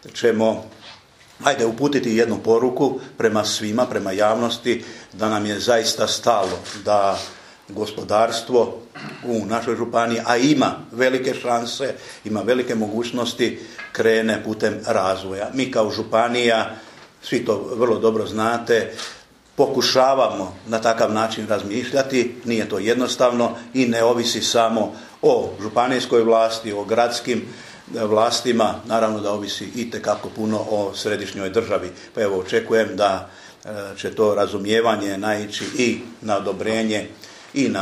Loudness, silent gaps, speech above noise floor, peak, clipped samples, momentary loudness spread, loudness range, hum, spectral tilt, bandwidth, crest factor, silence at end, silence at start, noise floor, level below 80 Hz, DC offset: -20 LUFS; none; 27 dB; 0 dBFS; under 0.1%; 10 LU; 3 LU; none; -4 dB/octave; 14 kHz; 20 dB; 0 s; 0.05 s; -47 dBFS; -62 dBFS; under 0.1%